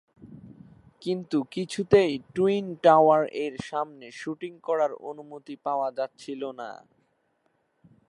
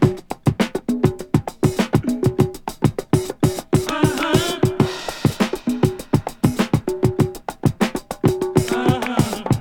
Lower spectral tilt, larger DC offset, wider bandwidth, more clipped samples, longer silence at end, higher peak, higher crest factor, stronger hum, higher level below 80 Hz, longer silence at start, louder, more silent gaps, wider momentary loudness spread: about the same, -6 dB/octave vs -6 dB/octave; neither; second, 11.5 kHz vs 19.5 kHz; neither; first, 1.35 s vs 0 s; about the same, -4 dBFS vs -2 dBFS; about the same, 22 dB vs 18 dB; neither; second, -64 dBFS vs -40 dBFS; first, 0.25 s vs 0 s; second, -26 LUFS vs -20 LUFS; neither; first, 18 LU vs 4 LU